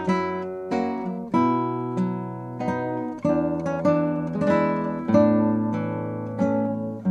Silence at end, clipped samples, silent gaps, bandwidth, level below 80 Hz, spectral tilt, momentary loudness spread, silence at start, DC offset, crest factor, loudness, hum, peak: 0 s; under 0.1%; none; 8.4 kHz; -58 dBFS; -8.5 dB/octave; 9 LU; 0 s; under 0.1%; 18 dB; -24 LUFS; none; -6 dBFS